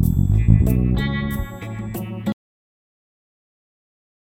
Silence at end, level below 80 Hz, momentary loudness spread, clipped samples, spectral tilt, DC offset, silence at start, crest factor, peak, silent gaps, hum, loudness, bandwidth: 2.05 s; -28 dBFS; 14 LU; under 0.1%; -8 dB/octave; under 0.1%; 0 s; 20 dB; 0 dBFS; none; none; -21 LUFS; 17 kHz